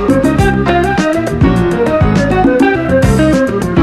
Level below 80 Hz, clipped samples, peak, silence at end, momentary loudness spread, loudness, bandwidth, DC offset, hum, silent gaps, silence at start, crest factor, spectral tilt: -24 dBFS; under 0.1%; 0 dBFS; 0 s; 3 LU; -11 LUFS; 14 kHz; under 0.1%; none; none; 0 s; 10 dB; -7 dB/octave